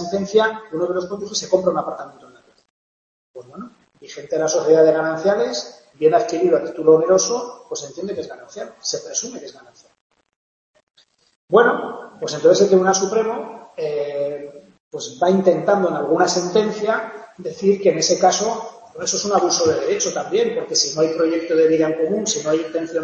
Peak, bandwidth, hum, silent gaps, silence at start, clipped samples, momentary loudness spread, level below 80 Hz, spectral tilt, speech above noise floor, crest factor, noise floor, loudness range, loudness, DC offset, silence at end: -2 dBFS; 8.2 kHz; none; 2.70-3.34 s, 10.01-10.10 s, 10.36-10.74 s, 10.83-10.87 s, 11.36-11.48 s, 14.80-14.91 s; 0 s; under 0.1%; 18 LU; -66 dBFS; -3.5 dB/octave; over 71 dB; 18 dB; under -90 dBFS; 8 LU; -18 LUFS; under 0.1%; 0 s